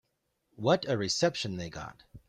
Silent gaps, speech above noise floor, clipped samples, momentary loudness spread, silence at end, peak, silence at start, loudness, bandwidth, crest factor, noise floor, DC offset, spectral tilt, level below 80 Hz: none; 47 dB; under 0.1%; 15 LU; 0.1 s; -12 dBFS; 0.6 s; -30 LUFS; 12 kHz; 20 dB; -78 dBFS; under 0.1%; -4.5 dB/octave; -62 dBFS